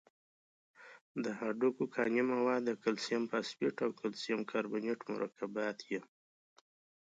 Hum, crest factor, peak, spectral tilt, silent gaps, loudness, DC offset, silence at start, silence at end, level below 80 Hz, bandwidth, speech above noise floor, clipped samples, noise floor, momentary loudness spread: none; 18 dB; -20 dBFS; -5 dB/octave; 1.01-1.15 s; -37 LUFS; under 0.1%; 0.8 s; 1 s; -86 dBFS; 9 kHz; over 54 dB; under 0.1%; under -90 dBFS; 8 LU